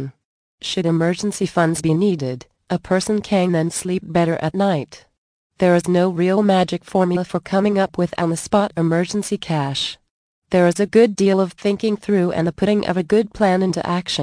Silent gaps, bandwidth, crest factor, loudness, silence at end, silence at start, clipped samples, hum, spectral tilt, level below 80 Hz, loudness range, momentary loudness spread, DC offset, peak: 0.25-0.58 s, 5.18-5.50 s, 10.10-10.42 s; 10.5 kHz; 16 dB; -19 LUFS; 0 s; 0 s; under 0.1%; none; -6 dB/octave; -52 dBFS; 3 LU; 7 LU; under 0.1%; -2 dBFS